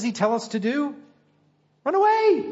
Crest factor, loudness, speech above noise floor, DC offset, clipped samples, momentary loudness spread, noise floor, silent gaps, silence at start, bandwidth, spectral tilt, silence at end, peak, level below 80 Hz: 16 dB; -23 LUFS; 42 dB; under 0.1%; under 0.1%; 11 LU; -64 dBFS; none; 0 s; 8 kHz; -5 dB/octave; 0 s; -8 dBFS; -76 dBFS